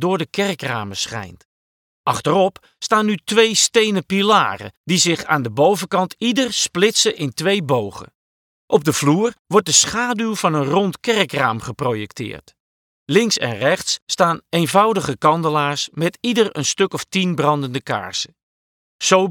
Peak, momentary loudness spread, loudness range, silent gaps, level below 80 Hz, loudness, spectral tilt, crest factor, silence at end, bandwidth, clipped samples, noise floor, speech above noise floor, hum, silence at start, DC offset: 0 dBFS; 9 LU; 4 LU; 1.45-2.04 s, 4.77-4.84 s, 8.15-8.68 s, 9.39-9.45 s, 12.60-13.06 s, 14.02-14.07 s, 18.43-18.99 s; -58 dBFS; -18 LUFS; -3.5 dB/octave; 18 dB; 0 s; 19 kHz; under 0.1%; under -90 dBFS; over 72 dB; none; 0 s; under 0.1%